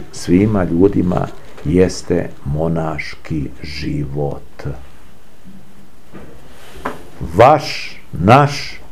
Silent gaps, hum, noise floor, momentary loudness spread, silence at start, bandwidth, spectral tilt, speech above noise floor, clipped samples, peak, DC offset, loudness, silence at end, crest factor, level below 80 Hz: none; none; -44 dBFS; 18 LU; 0 s; 15.5 kHz; -6.5 dB/octave; 29 dB; under 0.1%; 0 dBFS; 5%; -16 LUFS; 0.15 s; 18 dB; -36 dBFS